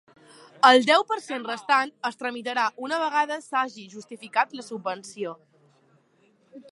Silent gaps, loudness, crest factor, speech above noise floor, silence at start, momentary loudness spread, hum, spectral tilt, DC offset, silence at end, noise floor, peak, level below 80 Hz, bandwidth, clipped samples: none; -24 LUFS; 24 dB; 39 dB; 0.65 s; 17 LU; none; -2.5 dB/octave; under 0.1%; 0.1 s; -63 dBFS; -2 dBFS; -84 dBFS; 11.5 kHz; under 0.1%